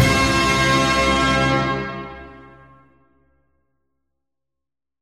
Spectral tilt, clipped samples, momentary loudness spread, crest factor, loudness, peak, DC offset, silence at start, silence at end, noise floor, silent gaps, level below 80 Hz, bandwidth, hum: -4 dB/octave; under 0.1%; 17 LU; 18 dB; -17 LUFS; -2 dBFS; under 0.1%; 0 s; 2.55 s; -87 dBFS; none; -36 dBFS; 16 kHz; none